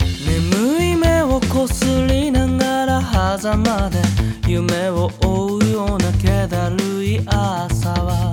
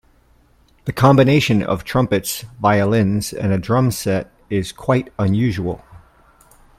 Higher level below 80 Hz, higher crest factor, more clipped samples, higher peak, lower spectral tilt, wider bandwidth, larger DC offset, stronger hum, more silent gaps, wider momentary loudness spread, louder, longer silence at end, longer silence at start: first, -26 dBFS vs -44 dBFS; about the same, 16 dB vs 18 dB; neither; about the same, -2 dBFS vs 0 dBFS; about the same, -6 dB/octave vs -6 dB/octave; first, 18 kHz vs 16 kHz; neither; neither; neither; second, 4 LU vs 11 LU; about the same, -18 LUFS vs -18 LUFS; second, 0 s vs 0.8 s; second, 0 s vs 0.85 s